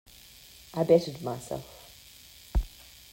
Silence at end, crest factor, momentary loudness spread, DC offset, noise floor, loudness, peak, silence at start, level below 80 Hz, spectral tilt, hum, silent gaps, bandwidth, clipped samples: 0.45 s; 22 dB; 25 LU; under 0.1%; -52 dBFS; -29 LUFS; -10 dBFS; 0.75 s; -40 dBFS; -6.5 dB/octave; none; none; 16.5 kHz; under 0.1%